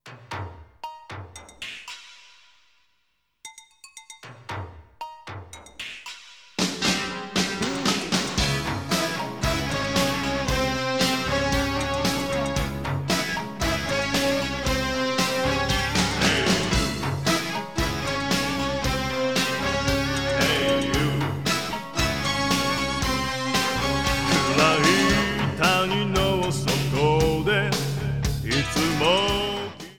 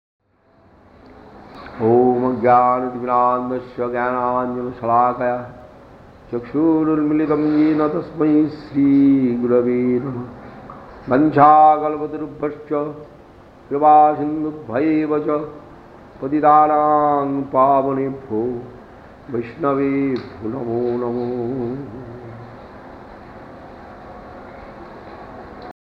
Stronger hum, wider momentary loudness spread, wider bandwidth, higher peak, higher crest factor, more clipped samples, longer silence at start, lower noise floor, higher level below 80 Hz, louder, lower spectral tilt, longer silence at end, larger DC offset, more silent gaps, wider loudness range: neither; second, 17 LU vs 24 LU; first, 19.5 kHz vs 5.4 kHz; second, -4 dBFS vs 0 dBFS; about the same, 22 dB vs 18 dB; neither; second, 0.05 s vs 1.35 s; first, -72 dBFS vs -54 dBFS; first, -38 dBFS vs -52 dBFS; second, -23 LUFS vs -18 LUFS; second, -4 dB/octave vs -10 dB/octave; second, 0 s vs 0.15 s; first, 0.4% vs under 0.1%; neither; first, 18 LU vs 10 LU